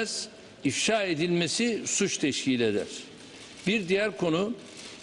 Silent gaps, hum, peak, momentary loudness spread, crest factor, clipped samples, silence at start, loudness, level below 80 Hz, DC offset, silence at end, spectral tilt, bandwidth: none; none; -14 dBFS; 15 LU; 16 dB; under 0.1%; 0 s; -27 LUFS; -66 dBFS; under 0.1%; 0 s; -3.5 dB/octave; 12.5 kHz